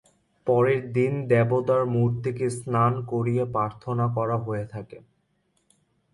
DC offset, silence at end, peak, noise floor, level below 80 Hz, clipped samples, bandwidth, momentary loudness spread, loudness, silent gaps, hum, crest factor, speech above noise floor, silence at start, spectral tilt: under 0.1%; 1.15 s; -8 dBFS; -70 dBFS; -60 dBFS; under 0.1%; 11.5 kHz; 10 LU; -25 LUFS; none; none; 18 dB; 46 dB; 0.45 s; -8.5 dB/octave